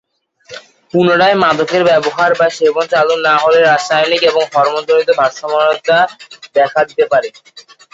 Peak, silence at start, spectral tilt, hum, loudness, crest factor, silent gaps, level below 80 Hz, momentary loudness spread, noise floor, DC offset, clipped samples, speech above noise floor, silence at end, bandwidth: 0 dBFS; 0.5 s; -4 dB/octave; none; -12 LUFS; 12 dB; none; -58 dBFS; 8 LU; -42 dBFS; under 0.1%; under 0.1%; 30 dB; 0.35 s; 8 kHz